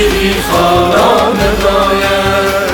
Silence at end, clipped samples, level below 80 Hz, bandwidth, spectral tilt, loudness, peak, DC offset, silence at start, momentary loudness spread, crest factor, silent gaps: 0 s; under 0.1%; -24 dBFS; over 20 kHz; -4.5 dB/octave; -10 LUFS; 0 dBFS; under 0.1%; 0 s; 3 LU; 10 dB; none